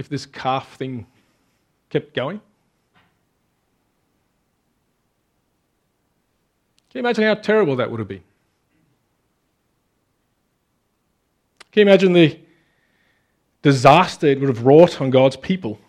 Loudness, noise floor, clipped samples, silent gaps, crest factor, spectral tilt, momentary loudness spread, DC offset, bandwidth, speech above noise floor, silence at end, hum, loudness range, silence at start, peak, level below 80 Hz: -17 LUFS; -69 dBFS; under 0.1%; none; 20 dB; -6.5 dB/octave; 18 LU; under 0.1%; 11.5 kHz; 53 dB; 0.15 s; none; 16 LU; 0 s; 0 dBFS; -62 dBFS